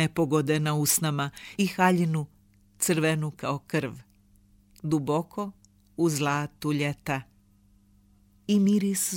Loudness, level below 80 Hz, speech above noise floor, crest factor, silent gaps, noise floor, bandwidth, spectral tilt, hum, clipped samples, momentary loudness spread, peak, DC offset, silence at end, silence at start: -27 LUFS; -62 dBFS; 35 dB; 20 dB; none; -61 dBFS; 17 kHz; -5 dB/octave; none; under 0.1%; 13 LU; -8 dBFS; under 0.1%; 0 s; 0 s